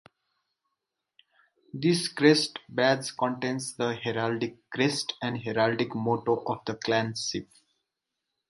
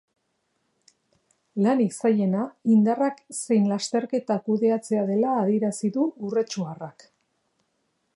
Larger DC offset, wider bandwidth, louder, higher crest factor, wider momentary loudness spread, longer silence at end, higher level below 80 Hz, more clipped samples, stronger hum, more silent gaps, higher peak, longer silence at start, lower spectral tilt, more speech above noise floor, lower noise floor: neither; about the same, 11.5 kHz vs 11.5 kHz; second, -28 LUFS vs -24 LUFS; first, 24 dB vs 16 dB; about the same, 10 LU vs 9 LU; second, 1.05 s vs 1.25 s; first, -68 dBFS vs -78 dBFS; neither; neither; neither; first, -6 dBFS vs -10 dBFS; first, 1.75 s vs 1.55 s; second, -4.5 dB/octave vs -6.5 dB/octave; first, 57 dB vs 51 dB; first, -85 dBFS vs -74 dBFS